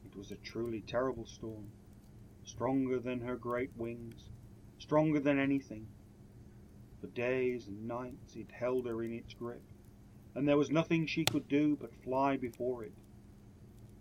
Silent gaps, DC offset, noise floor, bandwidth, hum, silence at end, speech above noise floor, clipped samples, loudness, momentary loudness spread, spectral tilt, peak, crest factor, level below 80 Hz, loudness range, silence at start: none; under 0.1%; -57 dBFS; 16.5 kHz; none; 0 s; 21 dB; under 0.1%; -36 LUFS; 23 LU; -6 dB/octave; -12 dBFS; 24 dB; -62 dBFS; 6 LU; 0 s